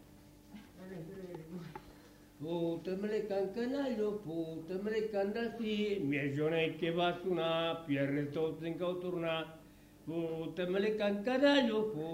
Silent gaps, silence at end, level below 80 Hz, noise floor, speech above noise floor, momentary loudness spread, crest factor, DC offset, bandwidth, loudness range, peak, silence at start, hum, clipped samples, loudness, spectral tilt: none; 0 s; -68 dBFS; -58 dBFS; 24 dB; 15 LU; 20 dB; under 0.1%; 16 kHz; 5 LU; -16 dBFS; 0 s; none; under 0.1%; -35 LUFS; -6.5 dB/octave